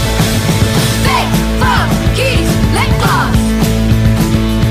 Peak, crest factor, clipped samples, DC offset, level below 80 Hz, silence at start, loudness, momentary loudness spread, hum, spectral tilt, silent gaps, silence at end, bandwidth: -2 dBFS; 10 dB; under 0.1%; under 0.1%; -18 dBFS; 0 s; -12 LUFS; 1 LU; none; -5 dB/octave; none; 0 s; 16 kHz